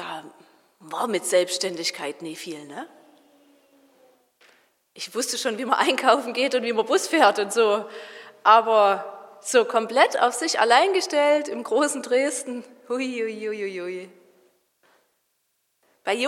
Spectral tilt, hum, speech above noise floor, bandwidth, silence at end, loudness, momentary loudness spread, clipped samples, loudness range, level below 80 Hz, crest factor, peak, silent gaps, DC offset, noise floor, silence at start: -2 dB/octave; none; 51 dB; 16.5 kHz; 0 s; -22 LUFS; 18 LU; under 0.1%; 13 LU; under -90 dBFS; 22 dB; -2 dBFS; none; under 0.1%; -73 dBFS; 0 s